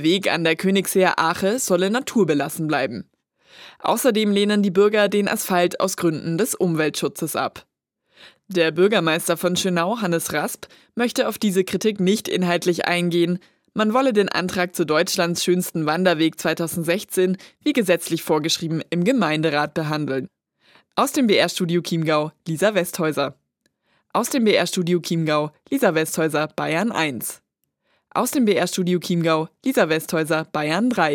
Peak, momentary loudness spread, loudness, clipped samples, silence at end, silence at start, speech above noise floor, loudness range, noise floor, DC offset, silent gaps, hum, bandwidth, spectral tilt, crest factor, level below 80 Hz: -2 dBFS; 7 LU; -21 LUFS; under 0.1%; 0 s; 0 s; 51 dB; 2 LU; -71 dBFS; under 0.1%; none; none; 18 kHz; -4.5 dB/octave; 18 dB; -68 dBFS